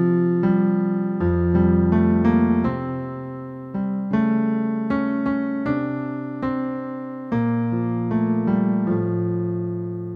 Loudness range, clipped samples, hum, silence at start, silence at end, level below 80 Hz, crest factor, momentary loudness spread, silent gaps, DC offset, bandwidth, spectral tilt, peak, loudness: 4 LU; under 0.1%; none; 0 s; 0 s; -44 dBFS; 14 dB; 11 LU; none; under 0.1%; 4.9 kHz; -11.5 dB/octave; -6 dBFS; -22 LUFS